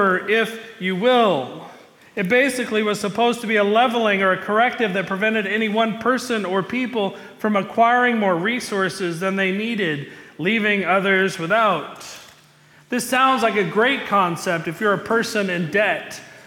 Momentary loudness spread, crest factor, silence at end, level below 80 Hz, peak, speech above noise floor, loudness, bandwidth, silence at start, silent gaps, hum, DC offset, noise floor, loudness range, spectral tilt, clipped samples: 9 LU; 14 dB; 0.05 s; -66 dBFS; -6 dBFS; 31 dB; -20 LUFS; 18 kHz; 0 s; none; none; under 0.1%; -51 dBFS; 2 LU; -4.5 dB/octave; under 0.1%